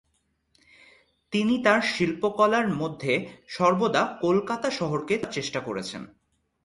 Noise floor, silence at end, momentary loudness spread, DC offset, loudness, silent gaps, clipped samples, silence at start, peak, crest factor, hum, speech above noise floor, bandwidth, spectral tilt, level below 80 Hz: -72 dBFS; 0.6 s; 10 LU; under 0.1%; -25 LUFS; none; under 0.1%; 1.3 s; -6 dBFS; 20 dB; none; 47 dB; 11.5 kHz; -5 dB/octave; -64 dBFS